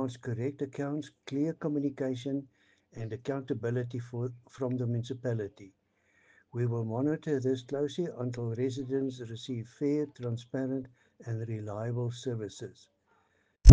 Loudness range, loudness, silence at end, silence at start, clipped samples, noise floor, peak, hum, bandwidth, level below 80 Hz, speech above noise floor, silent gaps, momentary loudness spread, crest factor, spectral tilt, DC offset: 3 LU; -34 LUFS; 0 s; 0 s; under 0.1%; -71 dBFS; -4 dBFS; none; 9 kHz; -44 dBFS; 37 dB; none; 8 LU; 26 dB; -7.5 dB/octave; under 0.1%